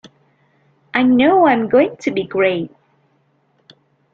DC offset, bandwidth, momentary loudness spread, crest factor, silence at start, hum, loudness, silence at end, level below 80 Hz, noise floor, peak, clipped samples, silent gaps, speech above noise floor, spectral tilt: under 0.1%; 7.2 kHz; 10 LU; 18 dB; 0.95 s; none; -15 LUFS; 1.45 s; -58 dBFS; -61 dBFS; 0 dBFS; under 0.1%; none; 46 dB; -6.5 dB/octave